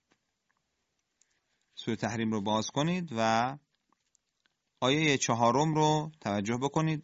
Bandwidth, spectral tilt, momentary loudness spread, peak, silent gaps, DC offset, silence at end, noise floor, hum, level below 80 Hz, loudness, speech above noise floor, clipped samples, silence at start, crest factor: 8 kHz; -5 dB/octave; 8 LU; -12 dBFS; none; under 0.1%; 0 s; -81 dBFS; none; -66 dBFS; -29 LUFS; 52 dB; under 0.1%; 1.75 s; 20 dB